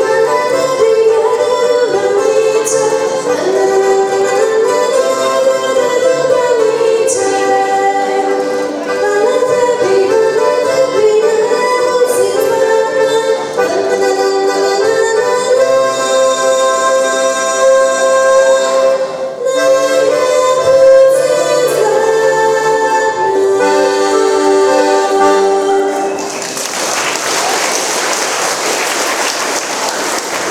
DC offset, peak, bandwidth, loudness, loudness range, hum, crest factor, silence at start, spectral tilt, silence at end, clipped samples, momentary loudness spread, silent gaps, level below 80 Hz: under 0.1%; 0 dBFS; 16 kHz; -11 LUFS; 3 LU; none; 12 dB; 0 s; -2 dB/octave; 0 s; under 0.1%; 4 LU; none; -58 dBFS